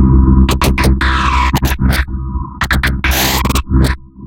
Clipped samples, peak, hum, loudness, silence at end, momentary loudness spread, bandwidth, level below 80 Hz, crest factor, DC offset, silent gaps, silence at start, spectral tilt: under 0.1%; 0 dBFS; none; -13 LUFS; 0 s; 7 LU; 17 kHz; -14 dBFS; 12 dB; under 0.1%; none; 0 s; -5 dB/octave